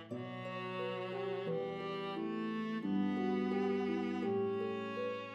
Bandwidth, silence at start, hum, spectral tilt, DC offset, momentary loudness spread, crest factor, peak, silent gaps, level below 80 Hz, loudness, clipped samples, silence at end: 7.8 kHz; 0 s; none; -7.5 dB/octave; under 0.1%; 6 LU; 14 dB; -24 dBFS; none; -80 dBFS; -38 LUFS; under 0.1%; 0 s